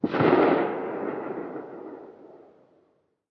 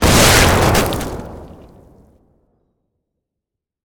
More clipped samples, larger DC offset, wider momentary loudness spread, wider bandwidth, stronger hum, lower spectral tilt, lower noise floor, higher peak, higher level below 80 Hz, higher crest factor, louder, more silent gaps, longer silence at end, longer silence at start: neither; neither; about the same, 22 LU vs 21 LU; second, 5.8 kHz vs over 20 kHz; neither; first, -9 dB/octave vs -3.5 dB/octave; second, -68 dBFS vs -82 dBFS; second, -8 dBFS vs 0 dBFS; second, -68 dBFS vs -26 dBFS; about the same, 20 dB vs 18 dB; second, -25 LUFS vs -12 LUFS; neither; second, 0.95 s vs 2.4 s; about the same, 0.05 s vs 0 s